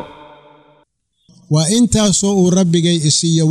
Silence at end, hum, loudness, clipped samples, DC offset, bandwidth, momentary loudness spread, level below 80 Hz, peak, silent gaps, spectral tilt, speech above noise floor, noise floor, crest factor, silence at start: 0 s; none; -13 LUFS; under 0.1%; under 0.1%; 13.5 kHz; 4 LU; -40 dBFS; -2 dBFS; none; -5 dB/octave; 47 dB; -60 dBFS; 12 dB; 0 s